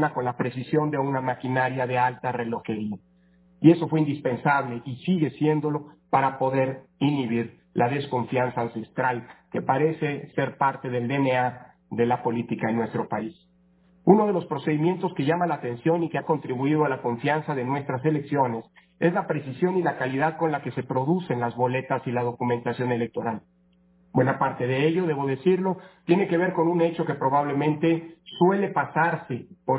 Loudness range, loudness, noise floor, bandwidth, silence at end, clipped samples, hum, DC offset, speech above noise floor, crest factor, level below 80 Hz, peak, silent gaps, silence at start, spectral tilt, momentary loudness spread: 3 LU; -25 LUFS; -61 dBFS; 4 kHz; 0 s; under 0.1%; none; under 0.1%; 36 dB; 22 dB; -66 dBFS; -2 dBFS; none; 0 s; -11.5 dB/octave; 7 LU